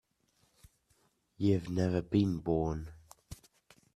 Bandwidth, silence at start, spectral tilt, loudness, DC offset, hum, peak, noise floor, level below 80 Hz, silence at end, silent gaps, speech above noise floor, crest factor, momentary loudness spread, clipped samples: 13.5 kHz; 1.4 s; -8 dB/octave; -32 LUFS; under 0.1%; none; -16 dBFS; -74 dBFS; -56 dBFS; 0.6 s; none; 43 dB; 20 dB; 22 LU; under 0.1%